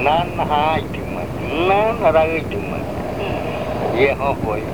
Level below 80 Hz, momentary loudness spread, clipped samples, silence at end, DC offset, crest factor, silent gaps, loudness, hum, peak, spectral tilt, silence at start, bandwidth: -36 dBFS; 10 LU; under 0.1%; 0 s; 1%; 16 dB; none; -19 LUFS; none; -2 dBFS; -6.5 dB/octave; 0 s; over 20 kHz